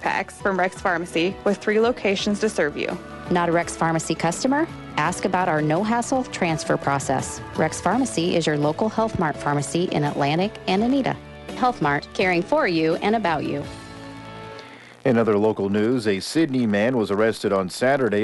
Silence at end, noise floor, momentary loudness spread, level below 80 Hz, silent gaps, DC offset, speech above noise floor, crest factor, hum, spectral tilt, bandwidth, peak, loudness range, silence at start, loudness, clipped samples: 0 s; -42 dBFS; 8 LU; -50 dBFS; none; under 0.1%; 20 dB; 16 dB; none; -5 dB/octave; 11.5 kHz; -6 dBFS; 2 LU; 0 s; -22 LUFS; under 0.1%